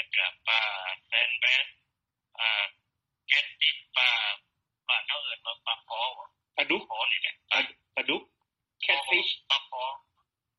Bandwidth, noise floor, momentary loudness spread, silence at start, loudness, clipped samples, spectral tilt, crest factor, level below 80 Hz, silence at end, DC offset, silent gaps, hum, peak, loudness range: 9 kHz; -84 dBFS; 11 LU; 0 s; -27 LUFS; under 0.1%; -1 dB/octave; 22 dB; -82 dBFS; 0.6 s; under 0.1%; none; none; -8 dBFS; 3 LU